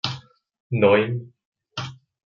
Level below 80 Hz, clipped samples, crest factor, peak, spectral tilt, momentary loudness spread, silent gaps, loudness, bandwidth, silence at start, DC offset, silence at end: -64 dBFS; under 0.1%; 20 dB; -4 dBFS; -6.5 dB/octave; 19 LU; 0.60-0.70 s, 1.45-1.52 s; -22 LUFS; 7.4 kHz; 0.05 s; under 0.1%; 0.35 s